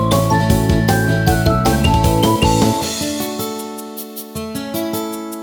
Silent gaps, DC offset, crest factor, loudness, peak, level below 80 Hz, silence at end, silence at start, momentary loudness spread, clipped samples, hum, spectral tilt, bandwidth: none; under 0.1%; 16 dB; -16 LUFS; 0 dBFS; -28 dBFS; 0 s; 0 s; 13 LU; under 0.1%; none; -5.5 dB/octave; over 20 kHz